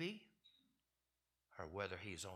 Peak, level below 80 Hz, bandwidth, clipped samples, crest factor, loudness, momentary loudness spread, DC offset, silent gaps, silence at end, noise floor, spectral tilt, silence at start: -28 dBFS; -76 dBFS; 15 kHz; under 0.1%; 24 dB; -49 LUFS; 16 LU; under 0.1%; none; 0 s; -90 dBFS; -4 dB/octave; 0 s